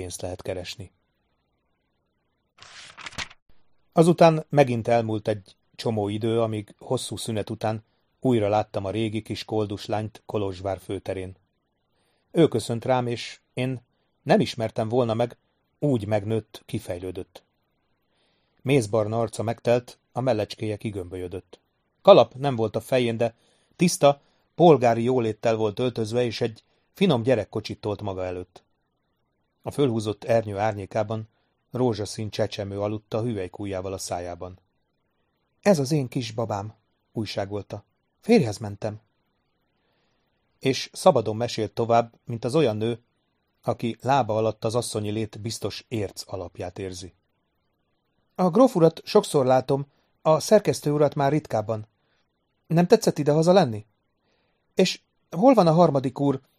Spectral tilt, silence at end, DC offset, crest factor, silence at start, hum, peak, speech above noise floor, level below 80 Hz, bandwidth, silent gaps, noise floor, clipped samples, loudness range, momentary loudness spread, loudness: -6 dB/octave; 0.2 s; under 0.1%; 24 dB; 0 s; none; 0 dBFS; 50 dB; -62 dBFS; 15 kHz; 3.42-3.46 s; -73 dBFS; under 0.1%; 7 LU; 16 LU; -24 LUFS